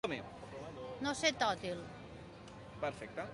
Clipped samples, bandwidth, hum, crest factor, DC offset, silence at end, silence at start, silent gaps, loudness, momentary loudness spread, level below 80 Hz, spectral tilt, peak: under 0.1%; 11.5 kHz; none; 22 dB; under 0.1%; 0 s; 0.05 s; none; -39 LUFS; 19 LU; -64 dBFS; -3.5 dB/octave; -18 dBFS